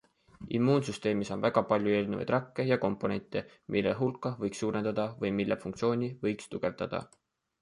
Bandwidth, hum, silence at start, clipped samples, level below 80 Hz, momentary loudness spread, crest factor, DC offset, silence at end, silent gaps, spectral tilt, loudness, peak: 11.5 kHz; none; 0.4 s; under 0.1%; -62 dBFS; 8 LU; 22 dB; under 0.1%; 0.55 s; none; -6.5 dB/octave; -31 LUFS; -10 dBFS